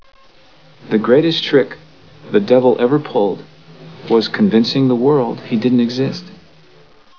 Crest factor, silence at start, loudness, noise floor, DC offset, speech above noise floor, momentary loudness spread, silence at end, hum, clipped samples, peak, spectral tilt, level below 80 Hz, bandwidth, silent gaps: 16 dB; 0.85 s; -15 LUFS; -48 dBFS; 0.4%; 34 dB; 9 LU; 0.85 s; none; under 0.1%; 0 dBFS; -7 dB/octave; -62 dBFS; 5.4 kHz; none